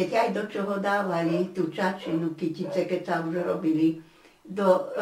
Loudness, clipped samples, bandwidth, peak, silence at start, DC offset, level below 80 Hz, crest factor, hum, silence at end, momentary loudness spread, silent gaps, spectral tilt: -27 LUFS; under 0.1%; 16 kHz; -10 dBFS; 0 s; under 0.1%; -72 dBFS; 18 dB; none; 0 s; 6 LU; none; -7 dB/octave